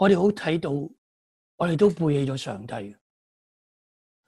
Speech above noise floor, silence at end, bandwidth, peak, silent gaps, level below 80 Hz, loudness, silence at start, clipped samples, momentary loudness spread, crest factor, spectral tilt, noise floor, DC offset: over 67 dB; 1.35 s; 12 kHz; -6 dBFS; 0.98-1.58 s; -60 dBFS; -24 LUFS; 0 s; under 0.1%; 15 LU; 18 dB; -7 dB/octave; under -90 dBFS; under 0.1%